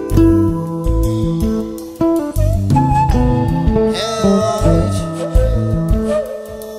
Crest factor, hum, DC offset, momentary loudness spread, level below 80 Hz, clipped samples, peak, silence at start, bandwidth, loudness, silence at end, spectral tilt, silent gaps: 14 dB; none; under 0.1%; 7 LU; -20 dBFS; under 0.1%; 0 dBFS; 0 s; 15.5 kHz; -16 LUFS; 0 s; -7.5 dB/octave; none